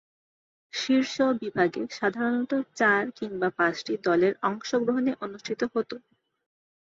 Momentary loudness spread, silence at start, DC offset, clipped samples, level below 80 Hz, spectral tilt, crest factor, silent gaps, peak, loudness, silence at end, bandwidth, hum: 10 LU; 0.75 s; under 0.1%; under 0.1%; -70 dBFS; -4.5 dB/octave; 18 dB; none; -8 dBFS; -27 LUFS; 0.85 s; 7.8 kHz; none